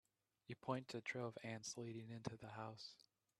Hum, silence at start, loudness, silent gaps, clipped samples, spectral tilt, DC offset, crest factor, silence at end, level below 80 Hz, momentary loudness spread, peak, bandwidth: none; 0.5 s; -51 LUFS; none; under 0.1%; -4.5 dB/octave; under 0.1%; 22 dB; 0.45 s; -84 dBFS; 10 LU; -28 dBFS; 13 kHz